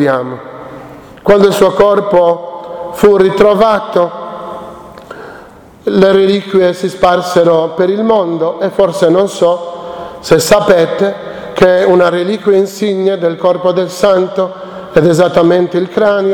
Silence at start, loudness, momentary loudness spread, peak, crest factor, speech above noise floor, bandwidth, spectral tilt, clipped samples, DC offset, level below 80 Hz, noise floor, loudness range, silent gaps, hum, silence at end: 0 s; -10 LUFS; 17 LU; 0 dBFS; 10 dB; 26 dB; 18.5 kHz; -5.5 dB/octave; 0.5%; under 0.1%; -42 dBFS; -35 dBFS; 3 LU; none; none; 0 s